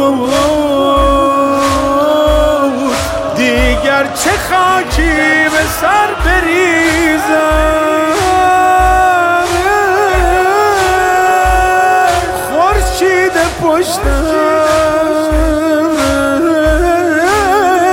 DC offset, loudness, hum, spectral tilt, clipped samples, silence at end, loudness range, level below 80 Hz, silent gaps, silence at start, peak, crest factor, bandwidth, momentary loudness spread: under 0.1%; -10 LUFS; none; -4.5 dB/octave; under 0.1%; 0 s; 2 LU; -22 dBFS; none; 0 s; 0 dBFS; 10 dB; 17 kHz; 3 LU